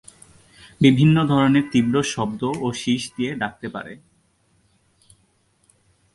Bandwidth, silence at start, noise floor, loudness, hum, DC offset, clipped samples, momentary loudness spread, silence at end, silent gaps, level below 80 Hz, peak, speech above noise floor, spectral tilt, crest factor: 11.5 kHz; 0.8 s; -63 dBFS; -20 LUFS; none; under 0.1%; under 0.1%; 15 LU; 2.2 s; none; -54 dBFS; -2 dBFS; 44 dB; -6 dB/octave; 20 dB